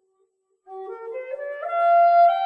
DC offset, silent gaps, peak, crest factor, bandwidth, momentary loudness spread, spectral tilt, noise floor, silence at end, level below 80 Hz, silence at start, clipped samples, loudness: under 0.1%; none; -8 dBFS; 12 dB; 5.2 kHz; 21 LU; -2 dB/octave; -69 dBFS; 0 s; -84 dBFS; 0.7 s; under 0.1%; -19 LUFS